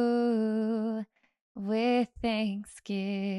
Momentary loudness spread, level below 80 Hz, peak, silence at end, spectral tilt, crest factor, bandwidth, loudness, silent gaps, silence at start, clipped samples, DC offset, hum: 13 LU; -60 dBFS; -16 dBFS; 0 s; -6.5 dB/octave; 14 dB; 11.5 kHz; -30 LUFS; 1.41-1.55 s; 0 s; under 0.1%; under 0.1%; none